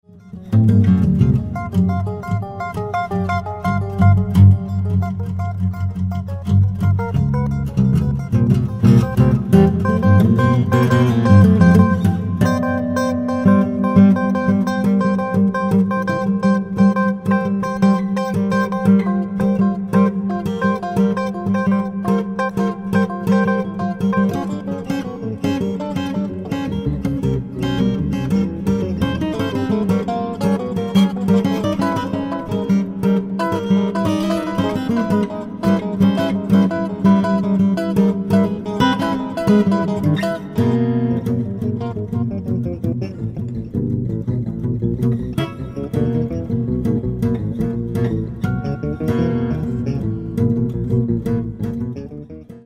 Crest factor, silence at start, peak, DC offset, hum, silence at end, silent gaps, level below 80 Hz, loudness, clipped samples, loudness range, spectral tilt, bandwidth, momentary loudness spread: 16 dB; 0.15 s; 0 dBFS; under 0.1%; none; 0.05 s; none; -38 dBFS; -18 LUFS; under 0.1%; 7 LU; -8.5 dB/octave; 13 kHz; 10 LU